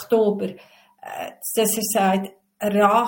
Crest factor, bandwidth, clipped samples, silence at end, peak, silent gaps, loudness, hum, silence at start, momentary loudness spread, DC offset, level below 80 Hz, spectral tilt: 16 dB; 17 kHz; under 0.1%; 0 s; -4 dBFS; none; -21 LUFS; none; 0 s; 16 LU; under 0.1%; -66 dBFS; -4 dB/octave